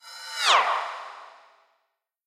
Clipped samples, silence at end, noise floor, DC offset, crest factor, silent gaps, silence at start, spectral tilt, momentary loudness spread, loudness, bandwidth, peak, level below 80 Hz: under 0.1%; 1 s; -77 dBFS; under 0.1%; 22 dB; none; 0.05 s; 3 dB/octave; 22 LU; -23 LUFS; 15.5 kHz; -6 dBFS; -82 dBFS